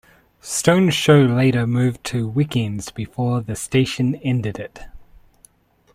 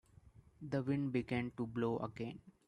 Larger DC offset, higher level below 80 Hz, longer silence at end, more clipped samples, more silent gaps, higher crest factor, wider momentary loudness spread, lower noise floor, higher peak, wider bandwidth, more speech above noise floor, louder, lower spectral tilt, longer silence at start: neither; first, -48 dBFS vs -68 dBFS; first, 0.9 s vs 0.15 s; neither; neither; about the same, 20 dB vs 18 dB; first, 15 LU vs 10 LU; second, -55 dBFS vs -63 dBFS; first, 0 dBFS vs -22 dBFS; first, 15.5 kHz vs 10.5 kHz; first, 36 dB vs 24 dB; first, -19 LUFS vs -40 LUFS; second, -5.5 dB/octave vs -8.5 dB/octave; first, 0.45 s vs 0.25 s